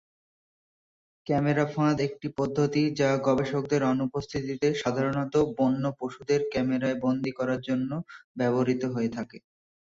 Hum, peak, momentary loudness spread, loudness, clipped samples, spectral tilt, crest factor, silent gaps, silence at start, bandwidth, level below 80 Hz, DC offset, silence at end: none; -10 dBFS; 7 LU; -27 LUFS; under 0.1%; -7 dB/octave; 16 dB; 8.24-8.35 s; 1.25 s; 7.6 kHz; -60 dBFS; under 0.1%; 0.6 s